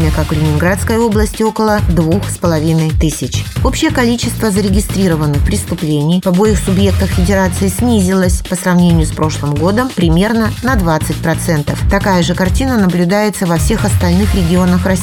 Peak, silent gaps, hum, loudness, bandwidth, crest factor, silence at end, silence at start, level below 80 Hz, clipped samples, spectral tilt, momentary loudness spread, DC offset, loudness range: 0 dBFS; none; none; -13 LUFS; 18 kHz; 12 dB; 0 s; 0 s; -22 dBFS; under 0.1%; -6 dB/octave; 4 LU; under 0.1%; 1 LU